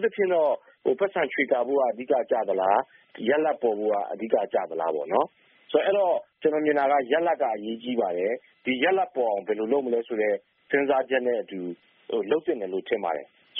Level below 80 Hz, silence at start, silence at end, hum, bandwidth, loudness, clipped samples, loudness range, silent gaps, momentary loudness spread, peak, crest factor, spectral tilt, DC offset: -74 dBFS; 0 s; 0 s; none; 3.8 kHz; -26 LUFS; under 0.1%; 2 LU; none; 8 LU; -8 dBFS; 18 dB; -2.5 dB/octave; under 0.1%